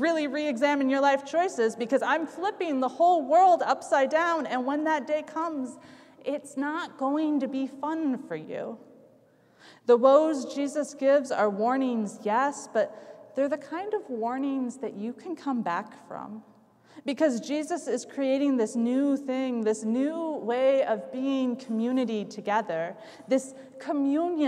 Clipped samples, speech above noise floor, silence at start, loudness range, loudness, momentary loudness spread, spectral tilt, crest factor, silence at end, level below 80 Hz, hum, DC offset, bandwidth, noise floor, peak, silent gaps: under 0.1%; 34 dB; 0 s; 7 LU; -27 LUFS; 12 LU; -5 dB/octave; 20 dB; 0 s; -84 dBFS; none; under 0.1%; 11.5 kHz; -60 dBFS; -8 dBFS; none